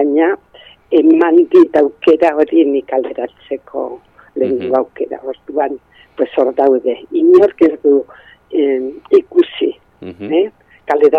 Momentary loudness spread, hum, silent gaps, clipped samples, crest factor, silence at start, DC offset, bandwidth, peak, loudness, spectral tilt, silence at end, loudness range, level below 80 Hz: 16 LU; none; none; under 0.1%; 12 dB; 0 s; under 0.1%; 4.9 kHz; 0 dBFS; -14 LUFS; -7 dB/octave; 0 s; 7 LU; -58 dBFS